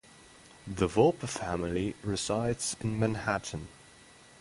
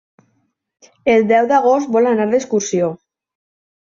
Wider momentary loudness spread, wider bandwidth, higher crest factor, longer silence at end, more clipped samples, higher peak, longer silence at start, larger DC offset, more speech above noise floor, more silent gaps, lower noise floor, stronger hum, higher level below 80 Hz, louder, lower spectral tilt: first, 16 LU vs 7 LU; first, 11.5 kHz vs 7.6 kHz; first, 22 dB vs 14 dB; second, 0.65 s vs 1 s; neither; second, -10 dBFS vs -2 dBFS; second, 0.2 s vs 1.05 s; neither; second, 25 dB vs 51 dB; neither; second, -56 dBFS vs -65 dBFS; neither; first, -52 dBFS vs -60 dBFS; second, -31 LUFS vs -15 LUFS; about the same, -5 dB/octave vs -5 dB/octave